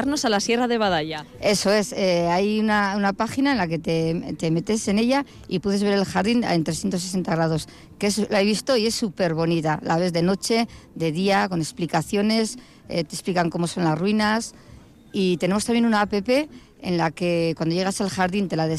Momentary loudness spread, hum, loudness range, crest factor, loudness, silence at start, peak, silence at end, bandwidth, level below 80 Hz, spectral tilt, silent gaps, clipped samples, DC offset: 6 LU; none; 2 LU; 12 dB; -22 LUFS; 0 s; -10 dBFS; 0 s; 15 kHz; -52 dBFS; -5 dB/octave; none; under 0.1%; under 0.1%